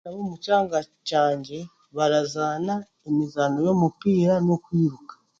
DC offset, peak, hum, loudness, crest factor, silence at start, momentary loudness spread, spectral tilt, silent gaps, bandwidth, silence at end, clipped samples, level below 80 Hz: under 0.1%; -8 dBFS; none; -24 LUFS; 16 dB; 0.05 s; 11 LU; -6.5 dB/octave; none; 7.6 kHz; 0.25 s; under 0.1%; -62 dBFS